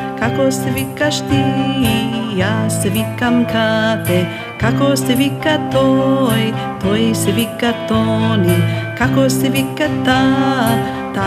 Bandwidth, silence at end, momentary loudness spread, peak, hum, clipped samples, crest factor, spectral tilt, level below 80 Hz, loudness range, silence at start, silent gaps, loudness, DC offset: 16 kHz; 0 s; 5 LU; 0 dBFS; none; under 0.1%; 14 dB; -5.5 dB/octave; -40 dBFS; 1 LU; 0 s; none; -15 LUFS; under 0.1%